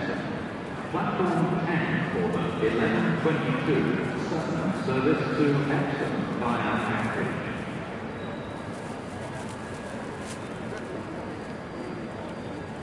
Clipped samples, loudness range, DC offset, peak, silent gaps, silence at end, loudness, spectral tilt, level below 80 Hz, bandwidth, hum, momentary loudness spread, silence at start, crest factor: under 0.1%; 10 LU; under 0.1%; -12 dBFS; none; 0 s; -29 LUFS; -7 dB/octave; -56 dBFS; 11.5 kHz; none; 11 LU; 0 s; 18 dB